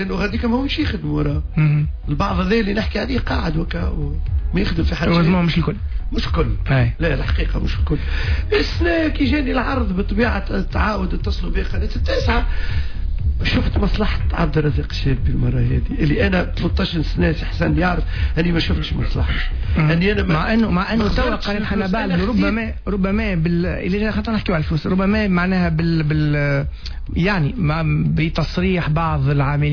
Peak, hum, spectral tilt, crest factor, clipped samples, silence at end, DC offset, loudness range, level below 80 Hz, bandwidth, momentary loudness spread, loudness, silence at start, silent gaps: -6 dBFS; none; -8 dB/octave; 12 dB; under 0.1%; 0 s; under 0.1%; 2 LU; -24 dBFS; 5.4 kHz; 6 LU; -19 LUFS; 0 s; none